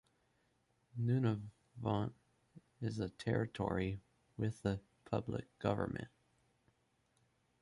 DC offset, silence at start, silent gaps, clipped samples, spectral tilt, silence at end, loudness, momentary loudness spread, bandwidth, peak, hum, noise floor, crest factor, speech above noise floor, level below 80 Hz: under 0.1%; 0.95 s; none; under 0.1%; -8 dB/octave; 1.55 s; -40 LUFS; 11 LU; 11.5 kHz; -20 dBFS; none; -78 dBFS; 20 dB; 40 dB; -62 dBFS